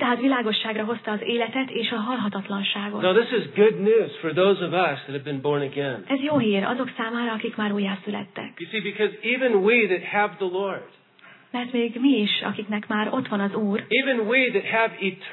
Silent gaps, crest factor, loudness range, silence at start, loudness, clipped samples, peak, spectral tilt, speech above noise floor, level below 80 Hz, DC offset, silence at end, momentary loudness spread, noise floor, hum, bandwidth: none; 18 dB; 3 LU; 0 s; -23 LUFS; under 0.1%; -6 dBFS; -8.5 dB/octave; 28 dB; -84 dBFS; under 0.1%; 0 s; 9 LU; -51 dBFS; none; 4.3 kHz